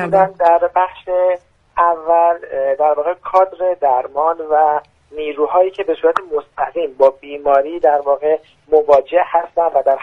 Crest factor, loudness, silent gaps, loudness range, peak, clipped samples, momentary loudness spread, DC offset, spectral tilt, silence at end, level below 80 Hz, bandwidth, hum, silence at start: 16 dB; -16 LUFS; none; 2 LU; 0 dBFS; under 0.1%; 8 LU; under 0.1%; -6.5 dB/octave; 0 s; -54 dBFS; 6 kHz; none; 0 s